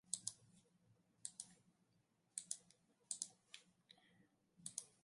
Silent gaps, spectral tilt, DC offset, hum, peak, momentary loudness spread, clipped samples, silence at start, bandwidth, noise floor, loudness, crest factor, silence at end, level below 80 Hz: none; 0 dB/octave; under 0.1%; none; -24 dBFS; 21 LU; under 0.1%; 0.1 s; 11.5 kHz; -81 dBFS; -51 LUFS; 34 dB; 0.15 s; under -90 dBFS